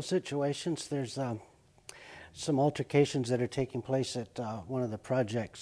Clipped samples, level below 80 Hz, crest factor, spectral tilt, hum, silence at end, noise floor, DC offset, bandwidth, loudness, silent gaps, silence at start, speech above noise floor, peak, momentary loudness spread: under 0.1%; -66 dBFS; 20 dB; -6 dB/octave; none; 0 s; -54 dBFS; under 0.1%; 11 kHz; -33 LUFS; none; 0 s; 22 dB; -14 dBFS; 19 LU